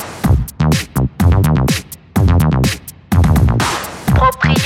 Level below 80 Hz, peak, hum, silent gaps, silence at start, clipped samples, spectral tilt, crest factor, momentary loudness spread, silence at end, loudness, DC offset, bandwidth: -22 dBFS; 0 dBFS; none; none; 0 s; under 0.1%; -6 dB/octave; 12 dB; 7 LU; 0 s; -14 LUFS; under 0.1%; 17.5 kHz